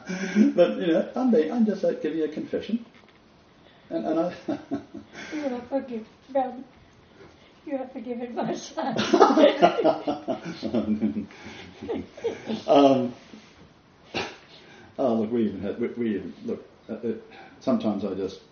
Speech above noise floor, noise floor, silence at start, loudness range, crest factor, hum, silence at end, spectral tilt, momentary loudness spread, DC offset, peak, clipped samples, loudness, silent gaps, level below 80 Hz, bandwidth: 30 dB; -55 dBFS; 0 s; 10 LU; 26 dB; none; 0.15 s; -5 dB/octave; 17 LU; under 0.1%; 0 dBFS; under 0.1%; -26 LUFS; none; -64 dBFS; 6.8 kHz